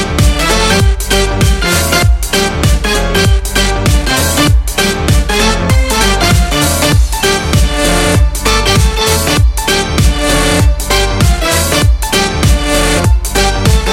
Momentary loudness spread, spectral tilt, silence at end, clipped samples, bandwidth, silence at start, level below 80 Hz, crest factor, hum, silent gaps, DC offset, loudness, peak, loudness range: 2 LU; -4 dB/octave; 0 s; under 0.1%; 17 kHz; 0 s; -14 dBFS; 10 dB; none; none; under 0.1%; -10 LUFS; 0 dBFS; 1 LU